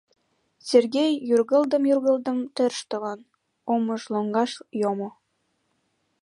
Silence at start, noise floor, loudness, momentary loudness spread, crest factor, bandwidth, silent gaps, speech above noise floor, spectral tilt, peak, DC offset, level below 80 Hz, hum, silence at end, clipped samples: 0.65 s; -73 dBFS; -24 LUFS; 12 LU; 20 dB; 11.5 kHz; none; 50 dB; -5 dB/octave; -6 dBFS; under 0.1%; -80 dBFS; none; 1.1 s; under 0.1%